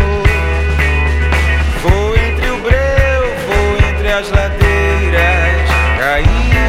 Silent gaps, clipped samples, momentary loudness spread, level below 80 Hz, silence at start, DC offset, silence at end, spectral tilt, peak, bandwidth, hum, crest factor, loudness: none; under 0.1%; 3 LU; -14 dBFS; 0 s; under 0.1%; 0 s; -6 dB/octave; 0 dBFS; 14 kHz; none; 12 dB; -13 LUFS